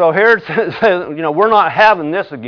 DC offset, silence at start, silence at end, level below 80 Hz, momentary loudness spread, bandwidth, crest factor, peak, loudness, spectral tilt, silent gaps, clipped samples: under 0.1%; 0 s; 0 s; -54 dBFS; 8 LU; 5.4 kHz; 12 dB; 0 dBFS; -12 LUFS; -6.5 dB/octave; none; under 0.1%